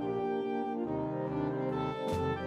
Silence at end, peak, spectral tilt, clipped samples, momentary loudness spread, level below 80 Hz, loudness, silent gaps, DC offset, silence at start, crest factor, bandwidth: 0 s; -22 dBFS; -8 dB/octave; under 0.1%; 1 LU; -58 dBFS; -34 LUFS; none; under 0.1%; 0 s; 12 dB; 13.5 kHz